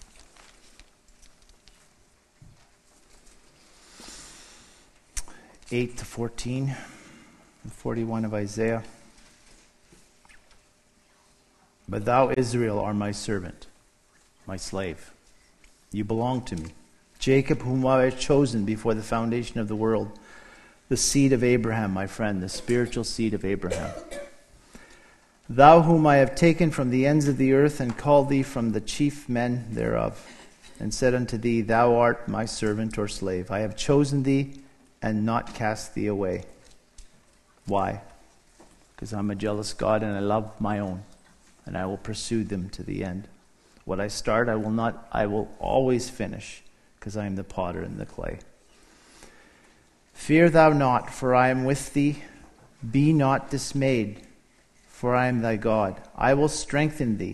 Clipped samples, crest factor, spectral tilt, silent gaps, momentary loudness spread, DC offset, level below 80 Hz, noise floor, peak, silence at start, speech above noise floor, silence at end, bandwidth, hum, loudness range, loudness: under 0.1%; 26 dB; -6 dB/octave; none; 16 LU; under 0.1%; -46 dBFS; -62 dBFS; 0 dBFS; 0.8 s; 38 dB; 0 s; 12.5 kHz; none; 13 LU; -25 LUFS